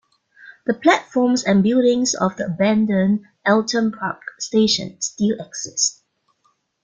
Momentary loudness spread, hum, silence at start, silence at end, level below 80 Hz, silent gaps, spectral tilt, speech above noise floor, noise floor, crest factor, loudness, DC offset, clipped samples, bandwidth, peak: 10 LU; none; 0.45 s; 0.9 s; -60 dBFS; none; -4 dB/octave; 47 dB; -65 dBFS; 18 dB; -19 LUFS; under 0.1%; under 0.1%; 9.6 kHz; -2 dBFS